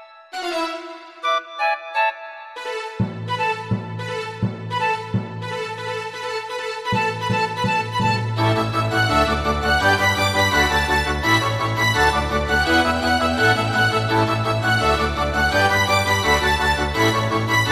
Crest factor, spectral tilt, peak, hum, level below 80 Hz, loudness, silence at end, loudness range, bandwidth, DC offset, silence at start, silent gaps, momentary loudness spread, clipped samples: 16 dB; -4.5 dB/octave; -4 dBFS; none; -36 dBFS; -20 LUFS; 0 s; 7 LU; 15.5 kHz; under 0.1%; 0 s; none; 10 LU; under 0.1%